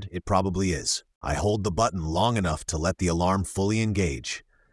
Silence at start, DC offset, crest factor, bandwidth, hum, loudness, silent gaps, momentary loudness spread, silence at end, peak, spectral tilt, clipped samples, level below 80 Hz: 0 s; under 0.1%; 16 dB; 12 kHz; none; -26 LUFS; 1.15-1.21 s; 5 LU; 0.3 s; -10 dBFS; -5 dB/octave; under 0.1%; -42 dBFS